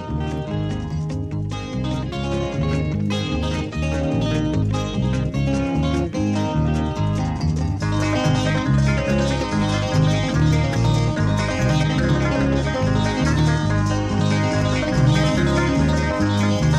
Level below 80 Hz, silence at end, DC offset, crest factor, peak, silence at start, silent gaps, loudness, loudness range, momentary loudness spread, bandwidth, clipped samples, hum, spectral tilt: -30 dBFS; 0 s; under 0.1%; 14 dB; -6 dBFS; 0 s; none; -21 LUFS; 4 LU; 7 LU; 10.5 kHz; under 0.1%; none; -6.5 dB/octave